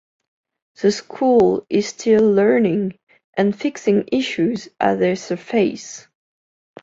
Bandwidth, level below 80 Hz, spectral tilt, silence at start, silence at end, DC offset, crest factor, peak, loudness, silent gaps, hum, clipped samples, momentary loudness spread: 7.8 kHz; -58 dBFS; -5.5 dB/octave; 0.8 s; 0.85 s; under 0.1%; 18 dB; -2 dBFS; -18 LUFS; 3.03-3.07 s, 3.24-3.33 s; none; under 0.1%; 10 LU